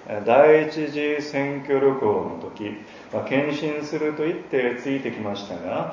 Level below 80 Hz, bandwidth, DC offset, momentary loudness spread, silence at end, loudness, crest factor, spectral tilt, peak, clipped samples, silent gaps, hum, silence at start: -62 dBFS; 7.4 kHz; under 0.1%; 16 LU; 0 s; -23 LUFS; 20 dB; -6.5 dB/octave; -2 dBFS; under 0.1%; none; none; 0 s